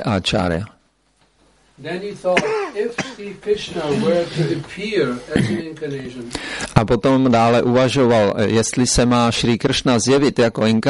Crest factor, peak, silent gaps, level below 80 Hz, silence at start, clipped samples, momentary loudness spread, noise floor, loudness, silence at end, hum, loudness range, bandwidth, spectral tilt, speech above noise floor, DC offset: 18 dB; 0 dBFS; none; -40 dBFS; 0 s; under 0.1%; 13 LU; -60 dBFS; -18 LUFS; 0 s; none; 7 LU; 11.5 kHz; -5 dB/octave; 43 dB; under 0.1%